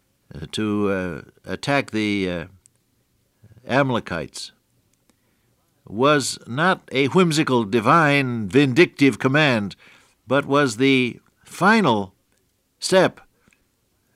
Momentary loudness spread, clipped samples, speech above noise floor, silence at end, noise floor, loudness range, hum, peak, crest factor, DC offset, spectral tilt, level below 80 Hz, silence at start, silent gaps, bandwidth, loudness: 17 LU; under 0.1%; 47 dB; 1.05 s; -67 dBFS; 8 LU; none; -4 dBFS; 18 dB; under 0.1%; -5 dB/octave; -60 dBFS; 0.35 s; none; 15 kHz; -20 LUFS